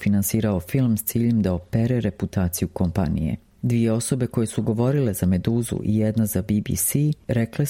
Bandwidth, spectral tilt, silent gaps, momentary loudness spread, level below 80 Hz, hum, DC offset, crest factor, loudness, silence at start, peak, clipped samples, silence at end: 16.5 kHz; -6.5 dB/octave; none; 3 LU; -42 dBFS; none; under 0.1%; 16 dB; -23 LUFS; 0 s; -6 dBFS; under 0.1%; 0 s